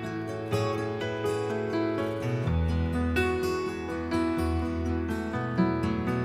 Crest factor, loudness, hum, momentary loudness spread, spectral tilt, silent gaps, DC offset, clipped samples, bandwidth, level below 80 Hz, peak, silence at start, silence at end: 18 dB; -29 LUFS; none; 4 LU; -7 dB/octave; none; under 0.1%; under 0.1%; 15 kHz; -40 dBFS; -12 dBFS; 0 s; 0 s